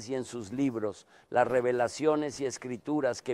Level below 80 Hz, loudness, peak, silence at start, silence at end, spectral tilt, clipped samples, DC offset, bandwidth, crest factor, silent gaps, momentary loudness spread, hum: -68 dBFS; -31 LUFS; -12 dBFS; 0 s; 0 s; -5 dB/octave; under 0.1%; under 0.1%; 12.5 kHz; 20 dB; none; 11 LU; none